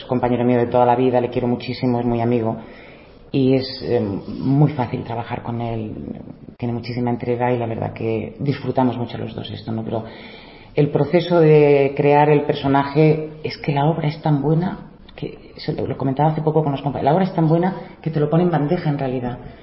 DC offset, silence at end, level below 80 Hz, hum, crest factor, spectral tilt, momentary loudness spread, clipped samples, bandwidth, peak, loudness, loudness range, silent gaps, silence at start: under 0.1%; 0 s; -48 dBFS; none; 16 dB; -12.5 dB/octave; 13 LU; under 0.1%; 5.8 kHz; -2 dBFS; -19 LUFS; 7 LU; none; 0 s